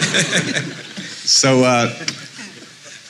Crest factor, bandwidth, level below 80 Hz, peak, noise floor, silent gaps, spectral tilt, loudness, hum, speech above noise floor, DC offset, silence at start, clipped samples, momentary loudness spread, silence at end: 16 dB; 13.5 kHz; -68 dBFS; -4 dBFS; -39 dBFS; none; -3 dB/octave; -15 LUFS; none; 23 dB; under 0.1%; 0 s; under 0.1%; 22 LU; 0 s